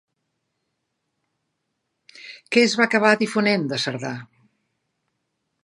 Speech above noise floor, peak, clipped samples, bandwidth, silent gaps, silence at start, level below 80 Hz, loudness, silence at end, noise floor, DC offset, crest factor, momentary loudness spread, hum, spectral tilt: 57 dB; -2 dBFS; under 0.1%; 11.5 kHz; none; 2.15 s; -76 dBFS; -20 LUFS; 1.4 s; -77 dBFS; under 0.1%; 24 dB; 19 LU; none; -4.5 dB/octave